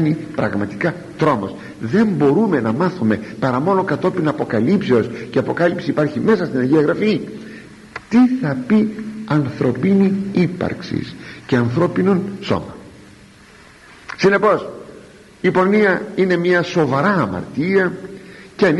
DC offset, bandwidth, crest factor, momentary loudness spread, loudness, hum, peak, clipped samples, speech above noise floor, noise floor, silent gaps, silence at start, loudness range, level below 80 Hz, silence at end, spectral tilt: under 0.1%; 11.5 kHz; 14 dB; 14 LU; -17 LUFS; none; -2 dBFS; under 0.1%; 27 dB; -44 dBFS; none; 0 s; 4 LU; -52 dBFS; 0 s; -7.5 dB/octave